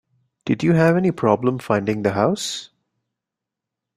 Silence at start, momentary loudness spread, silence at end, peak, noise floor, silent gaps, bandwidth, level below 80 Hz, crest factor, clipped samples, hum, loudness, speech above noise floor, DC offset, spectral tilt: 0.45 s; 10 LU; 1.3 s; -2 dBFS; -85 dBFS; none; 14.5 kHz; -58 dBFS; 20 dB; under 0.1%; none; -19 LUFS; 66 dB; under 0.1%; -6 dB/octave